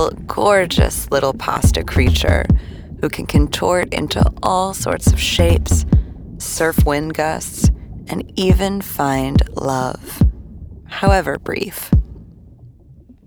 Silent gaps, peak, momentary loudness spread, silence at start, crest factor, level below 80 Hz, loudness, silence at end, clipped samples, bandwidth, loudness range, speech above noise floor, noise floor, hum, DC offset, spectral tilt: none; 0 dBFS; 10 LU; 0 s; 16 dB; -22 dBFS; -17 LUFS; 0.35 s; under 0.1%; over 20 kHz; 3 LU; 28 dB; -44 dBFS; none; under 0.1%; -5.5 dB/octave